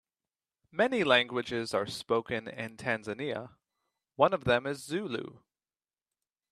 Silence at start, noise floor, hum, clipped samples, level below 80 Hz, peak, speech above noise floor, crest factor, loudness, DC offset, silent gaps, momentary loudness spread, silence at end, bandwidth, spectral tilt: 0.75 s; under -90 dBFS; none; under 0.1%; -64 dBFS; -8 dBFS; over 59 dB; 24 dB; -31 LUFS; under 0.1%; none; 15 LU; 1.15 s; 13.5 kHz; -4.5 dB/octave